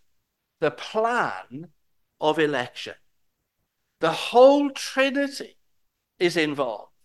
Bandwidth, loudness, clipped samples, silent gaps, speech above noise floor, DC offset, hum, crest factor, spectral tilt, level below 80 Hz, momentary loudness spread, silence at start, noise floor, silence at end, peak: 12.5 kHz; -23 LUFS; under 0.1%; none; 54 dB; under 0.1%; none; 20 dB; -4.5 dB/octave; -74 dBFS; 21 LU; 0.6 s; -77 dBFS; 0.2 s; -4 dBFS